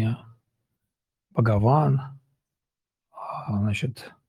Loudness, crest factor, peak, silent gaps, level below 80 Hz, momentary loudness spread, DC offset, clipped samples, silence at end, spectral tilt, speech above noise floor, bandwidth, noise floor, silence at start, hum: -25 LUFS; 20 dB; -8 dBFS; none; -56 dBFS; 16 LU; under 0.1%; under 0.1%; 0.2 s; -8.5 dB/octave; 66 dB; 11.5 kHz; -88 dBFS; 0 s; none